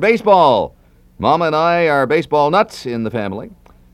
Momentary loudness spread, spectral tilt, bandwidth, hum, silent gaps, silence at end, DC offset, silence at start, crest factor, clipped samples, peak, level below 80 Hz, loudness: 12 LU; -6 dB/octave; 13.5 kHz; none; none; 0.4 s; under 0.1%; 0 s; 16 dB; under 0.1%; 0 dBFS; -48 dBFS; -15 LUFS